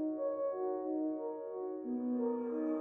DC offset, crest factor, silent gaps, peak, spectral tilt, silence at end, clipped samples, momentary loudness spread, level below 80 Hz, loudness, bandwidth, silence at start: under 0.1%; 10 dB; none; -26 dBFS; -10.5 dB/octave; 0 s; under 0.1%; 6 LU; -88 dBFS; -38 LUFS; 2.6 kHz; 0 s